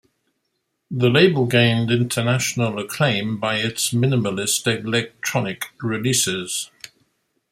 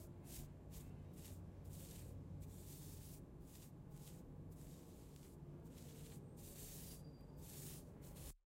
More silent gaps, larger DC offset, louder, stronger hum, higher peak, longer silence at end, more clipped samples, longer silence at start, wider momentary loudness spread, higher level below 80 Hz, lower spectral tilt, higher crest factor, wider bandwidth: neither; neither; first, -20 LUFS vs -56 LUFS; neither; first, -2 dBFS vs -40 dBFS; first, 0.85 s vs 0.1 s; neither; first, 0.9 s vs 0 s; first, 10 LU vs 5 LU; first, -58 dBFS vs -64 dBFS; second, -4 dB/octave vs -5.5 dB/octave; about the same, 20 dB vs 16 dB; about the same, 16 kHz vs 16 kHz